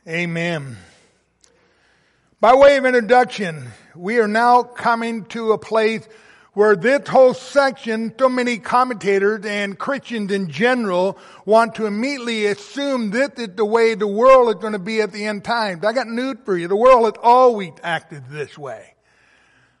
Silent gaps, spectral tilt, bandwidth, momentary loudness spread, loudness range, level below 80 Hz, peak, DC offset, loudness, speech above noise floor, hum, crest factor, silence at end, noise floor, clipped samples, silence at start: none; -5 dB/octave; 11.5 kHz; 13 LU; 4 LU; -54 dBFS; -2 dBFS; under 0.1%; -17 LUFS; 43 dB; none; 16 dB; 1 s; -60 dBFS; under 0.1%; 0.05 s